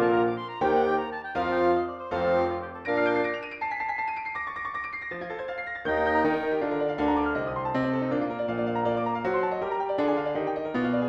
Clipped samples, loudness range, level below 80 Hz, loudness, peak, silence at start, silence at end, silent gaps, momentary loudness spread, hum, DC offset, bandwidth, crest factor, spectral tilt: under 0.1%; 3 LU; -54 dBFS; -27 LUFS; -12 dBFS; 0 s; 0 s; none; 8 LU; none; under 0.1%; 7.4 kHz; 16 dB; -7.5 dB/octave